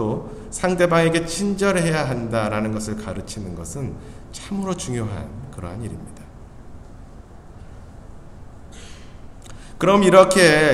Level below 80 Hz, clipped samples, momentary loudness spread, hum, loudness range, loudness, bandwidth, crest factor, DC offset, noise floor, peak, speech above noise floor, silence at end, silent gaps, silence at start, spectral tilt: -42 dBFS; under 0.1%; 25 LU; none; 22 LU; -20 LUFS; 14.5 kHz; 22 dB; under 0.1%; -40 dBFS; 0 dBFS; 21 dB; 0 s; none; 0 s; -5 dB/octave